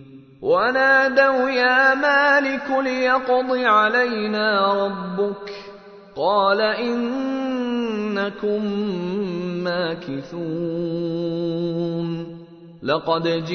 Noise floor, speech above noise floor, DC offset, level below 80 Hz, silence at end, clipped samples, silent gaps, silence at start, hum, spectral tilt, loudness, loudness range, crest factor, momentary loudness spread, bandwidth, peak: -42 dBFS; 22 dB; under 0.1%; -60 dBFS; 0 s; under 0.1%; none; 0 s; none; -6 dB/octave; -20 LUFS; 8 LU; 18 dB; 13 LU; 6.6 kHz; -2 dBFS